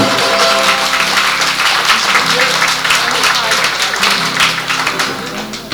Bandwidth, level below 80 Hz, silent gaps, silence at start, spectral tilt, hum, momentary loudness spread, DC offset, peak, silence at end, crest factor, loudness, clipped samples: over 20 kHz; -46 dBFS; none; 0 s; -1 dB/octave; 50 Hz at -45 dBFS; 5 LU; under 0.1%; 0 dBFS; 0 s; 12 dB; -11 LUFS; under 0.1%